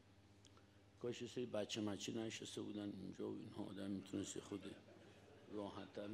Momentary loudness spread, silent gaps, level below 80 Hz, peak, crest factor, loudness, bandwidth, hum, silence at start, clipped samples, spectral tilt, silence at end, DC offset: 22 LU; none; -86 dBFS; -32 dBFS; 18 dB; -49 LUFS; 14.5 kHz; none; 0 s; under 0.1%; -4.5 dB/octave; 0 s; under 0.1%